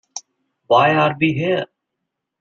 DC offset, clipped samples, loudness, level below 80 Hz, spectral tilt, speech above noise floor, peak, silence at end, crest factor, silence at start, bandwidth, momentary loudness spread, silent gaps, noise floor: under 0.1%; under 0.1%; -17 LUFS; -60 dBFS; -5.5 dB/octave; 63 dB; -2 dBFS; 0.75 s; 18 dB; 0.15 s; 7.6 kHz; 20 LU; none; -79 dBFS